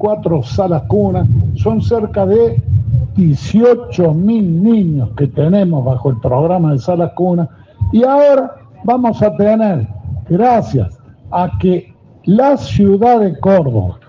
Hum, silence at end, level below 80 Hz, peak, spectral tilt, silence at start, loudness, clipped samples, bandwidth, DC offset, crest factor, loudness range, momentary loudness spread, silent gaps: none; 0.15 s; -36 dBFS; 0 dBFS; -9.5 dB/octave; 0 s; -13 LUFS; under 0.1%; 7.2 kHz; under 0.1%; 12 dB; 2 LU; 7 LU; none